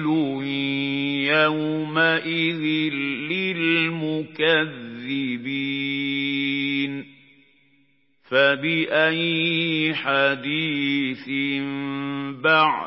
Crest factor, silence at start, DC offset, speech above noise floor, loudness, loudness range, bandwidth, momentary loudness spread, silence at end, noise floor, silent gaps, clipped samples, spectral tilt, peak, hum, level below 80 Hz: 18 dB; 0 s; under 0.1%; 42 dB; -22 LUFS; 4 LU; 5.8 kHz; 8 LU; 0 s; -64 dBFS; none; under 0.1%; -9.5 dB/octave; -4 dBFS; none; -78 dBFS